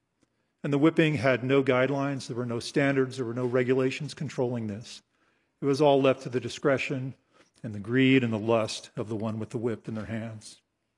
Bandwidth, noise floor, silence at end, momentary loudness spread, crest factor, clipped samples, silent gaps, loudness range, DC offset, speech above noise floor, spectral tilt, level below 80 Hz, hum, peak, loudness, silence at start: 11.5 kHz; -73 dBFS; 0.45 s; 15 LU; 20 dB; under 0.1%; none; 3 LU; under 0.1%; 46 dB; -6.5 dB/octave; -72 dBFS; none; -8 dBFS; -27 LUFS; 0.65 s